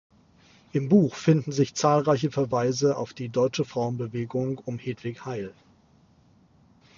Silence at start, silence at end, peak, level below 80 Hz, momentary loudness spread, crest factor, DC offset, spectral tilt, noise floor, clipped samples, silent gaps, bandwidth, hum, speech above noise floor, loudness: 0.75 s; 1.45 s; -6 dBFS; -64 dBFS; 12 LU; 20 dB; under 0.1%; -6.5 dB/octave; -59 dBFS; under 0.1%; none; 7.4 kHz; none; 34 dB; -26 LUFS